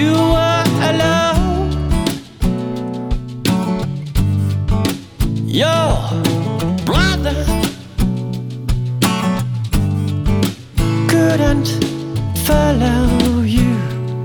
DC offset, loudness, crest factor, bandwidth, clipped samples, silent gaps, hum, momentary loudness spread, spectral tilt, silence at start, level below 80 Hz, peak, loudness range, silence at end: under 0.1%; -17 LUFS; 16 dB; over 20 kHz; under 0.1%; none; none; 8 LU; -6 dB/octave; 0 s; -24 dBFS; 0 dBFS; 4 LU; 0 s